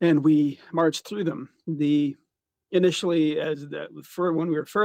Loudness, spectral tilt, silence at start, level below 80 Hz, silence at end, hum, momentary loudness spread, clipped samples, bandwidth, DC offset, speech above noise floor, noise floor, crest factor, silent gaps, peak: -24 LUFS; -6 dB/octave; 0 s; -74 dBFS; 0 s; none; 13 LU; under 0.1%; 15.5 kHz; under 0.1%; 55 dB; -78 dBFS; 14 dB; none; -10 dBFS